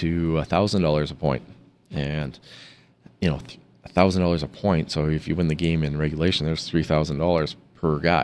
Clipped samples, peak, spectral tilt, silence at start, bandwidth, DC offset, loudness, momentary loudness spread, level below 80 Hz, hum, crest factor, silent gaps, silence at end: under 0.1%; -4 dBFS; -6.5 dB/octave; 0 s; 11 kHz; under 0.1%; -24 LUFS; 10 LU; -40 dBFS; none; 20 dB; none; 0 s